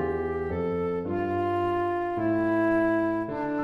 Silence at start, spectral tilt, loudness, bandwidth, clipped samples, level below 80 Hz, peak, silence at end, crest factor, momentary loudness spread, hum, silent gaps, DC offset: 0 s; -9 dB/octave; -27 LUFS; 5.2 kHz; under 0.1%; -50 dBFS; -16 dBFS; 0 s; 12 dB; 6 LU; none; none; under 0.1%